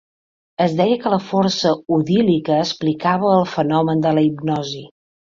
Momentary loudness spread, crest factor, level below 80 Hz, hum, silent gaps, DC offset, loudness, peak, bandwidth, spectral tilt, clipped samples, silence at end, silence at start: 6 LU; 16 dB; -58 dBFS; none; none; under 0.1%; -18 LUFS; -2 dBFS; 7.4 kHz; -6.5 dB/octave; under 0.1%; 0.35 s; 0.6 s